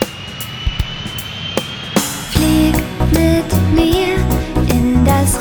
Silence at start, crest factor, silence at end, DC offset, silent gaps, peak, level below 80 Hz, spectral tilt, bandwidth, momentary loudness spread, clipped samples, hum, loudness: 0 s; 14 dB; 0 s; under 0.1%; none; 0 dBFS; -22 dBFS; -5 dB/octave; over 20 kHz; 10 LU; under 0.1%; none; -16 LUFS